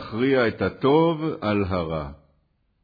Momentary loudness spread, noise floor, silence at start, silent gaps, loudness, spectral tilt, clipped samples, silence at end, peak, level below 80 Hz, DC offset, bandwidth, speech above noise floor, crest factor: 10 LU; -67 dBFS; 0 s; none; -23 LUFS; -9.5 dB/octave; under 0.1%; 0.7 s; -8 dBFS; -48 dBFS; under 0.1%; 5 kHz; 45 dB; 16 dB